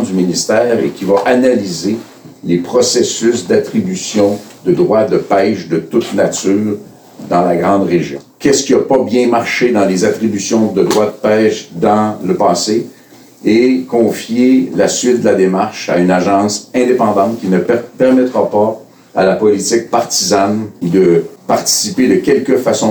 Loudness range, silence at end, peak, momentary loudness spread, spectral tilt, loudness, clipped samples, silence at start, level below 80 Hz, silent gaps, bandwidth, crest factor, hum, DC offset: 2 LU; 0 s; -2 dBFS; 6 LU; -4.5 dB/octave; -12 LUFS; under 0.1%; 0 s; -54 dBFS; none; over 20 kHz; 12 dB; none; under 0.1%